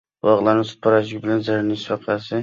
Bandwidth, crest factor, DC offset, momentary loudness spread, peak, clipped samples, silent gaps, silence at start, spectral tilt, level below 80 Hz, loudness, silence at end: 7.4 kHz; 16 dB; under 0.1%; 7 LU; -4 dBFS; under 0.1%; none; 0.25 s; -7 dB/octave; -58 dBFS; -20 LUFS; 0 s